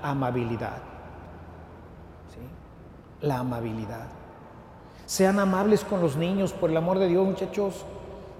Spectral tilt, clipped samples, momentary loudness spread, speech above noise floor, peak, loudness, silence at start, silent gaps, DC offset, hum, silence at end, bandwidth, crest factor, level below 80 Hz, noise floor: -6 dB/octave; under 0.1%; 24 LU; 21 dB; -8 dBFS; -26 LUFS; 0 s; none; under 0.1%; none; 0 s; 16 kHz; 20 dB; -52 dBFS; -47 dBFS